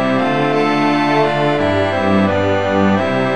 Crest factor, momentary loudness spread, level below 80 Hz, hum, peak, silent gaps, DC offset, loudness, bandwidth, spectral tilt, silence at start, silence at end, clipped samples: 14 dB; 1 LU; -48 dBFS; none; 0 dBFS; none; 2%; -15 LUFS; 10.5 kHz; -7 dB/octave; 0 s; 0 s; under 0.1%